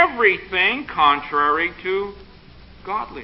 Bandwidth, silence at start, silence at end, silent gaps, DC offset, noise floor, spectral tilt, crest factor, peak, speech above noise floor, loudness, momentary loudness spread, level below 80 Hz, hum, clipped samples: 5.8 kHz; 0 s; 0 s; none; under 0.1%; -44 dBFS; -8.5 dB/octave; 18 dB; -2 dBFS; 24 dB; -19 LUFS; 11 LU; -48 dBFS; none; under 0.1%